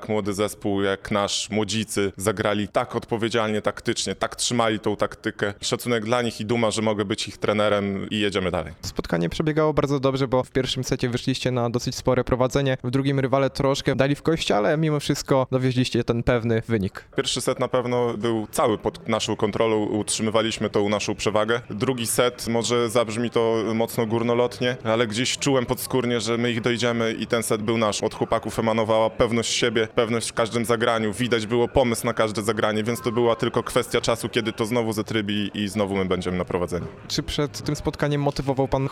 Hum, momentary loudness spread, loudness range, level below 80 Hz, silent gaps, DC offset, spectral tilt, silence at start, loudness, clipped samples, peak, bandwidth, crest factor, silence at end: none; 5 LU; 2 LU; -46 dBFS; none; under 0.1%; -4.5 dB/octave; 0 s; -23 LUFS; under 0.1%; -4 dBFS; 16.5 kHz; 18 dB; 0 s